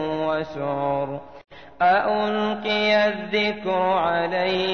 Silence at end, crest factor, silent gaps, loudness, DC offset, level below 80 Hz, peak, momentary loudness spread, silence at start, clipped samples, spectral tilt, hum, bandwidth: 0 s; 12 dB; none; -22 LUFS; 0.3%; -56 dBFS; -10 dBFS; 7 LU; 0 s; under 0.1%; -6 dB/octave; none; 6.6 kHz